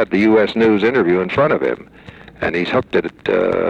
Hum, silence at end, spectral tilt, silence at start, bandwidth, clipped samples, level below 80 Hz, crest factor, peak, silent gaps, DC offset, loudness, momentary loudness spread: none; 0 s; -7.5 dB/octave; 0 s; 8 kHz; under 0.1%; -48 dBFS; 12 dB; -4 dBFS; none; under 0.1%; -16 LUFS; 8 LU